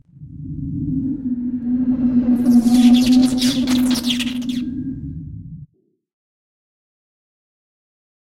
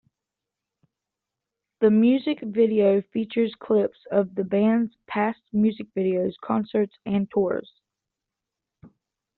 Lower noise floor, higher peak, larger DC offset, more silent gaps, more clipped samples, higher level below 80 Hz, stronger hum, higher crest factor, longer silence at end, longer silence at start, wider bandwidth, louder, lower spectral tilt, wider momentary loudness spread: second, -56 dBFS vs -87 dBFS; first, -2 dBFS vs -8 dBFS; neither; neither; neither; first, -42 dBFS vs -66 dBFS; neither; about the same, 16 dB vs 18 dB; first, 2.55 s vs 0.5 s; second, 0.2 s vs 1.8 s; first, 15.5 kHz vs 4.4 kHz; first, -17 LUFS vs -24 LUFS; second, -5 dB/octave vs -6.5 dB/octave; first, 19 LU vs 8 LU